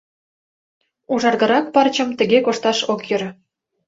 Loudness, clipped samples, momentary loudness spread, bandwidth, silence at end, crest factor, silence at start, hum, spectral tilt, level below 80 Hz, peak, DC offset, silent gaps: -18 LUFS; under 0.1%; 8 LU; 7.8 kHz; 0.55 s; 18 dB; 1.1 s; none; -4 dB/octave; -64 dBFS; -2 dBFS; under 0.1%; none